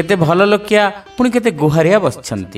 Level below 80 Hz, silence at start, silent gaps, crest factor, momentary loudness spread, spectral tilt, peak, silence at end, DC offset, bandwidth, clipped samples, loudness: -46 dBFS; 0 s; none; 14 dB; 7 LU; -6 dB/octave; 0 dBFS; 0 s; under 0.1%; 15 kHz; under 0.1%; -13 LUFS